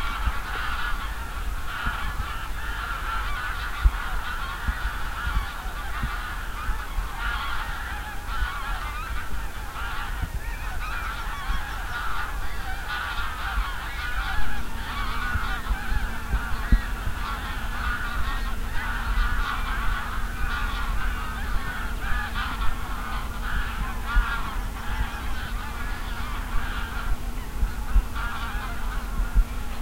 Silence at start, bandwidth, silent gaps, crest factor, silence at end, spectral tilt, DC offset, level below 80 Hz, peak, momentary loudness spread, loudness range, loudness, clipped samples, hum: 0 s; 16 kHz; none; 20 dB; 0 s; -4 dB/octave; under 0.1%; -28 dBFS; -6 dBFS; 5 LU; 3 LU; -30 LUFS; under 0.1%; none